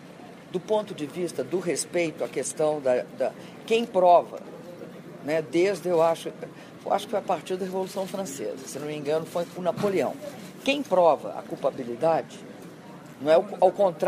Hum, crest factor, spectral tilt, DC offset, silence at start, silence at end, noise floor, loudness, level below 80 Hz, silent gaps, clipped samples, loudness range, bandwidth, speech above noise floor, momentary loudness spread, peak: none; 20 dB; -4.5 dB/octave; under 0.1%; 0 s; 0 s; -45 dBFS; -26 LUFS; -74 dBFS; none; under 0.1%; 5 LU; 15.5 kHz; 19 dB; 20 LU; -6 dBFS